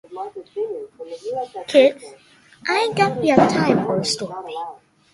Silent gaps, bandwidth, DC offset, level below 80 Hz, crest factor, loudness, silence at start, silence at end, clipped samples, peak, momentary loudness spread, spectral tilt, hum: none; 11.5 kHz; under 0.1%; -58 dBFS; 20 dB; -19 LUFS; 0.1 s; 0.35 s; under 0.1%; 0 dBFS; 17 LU; -5 dB/octave; none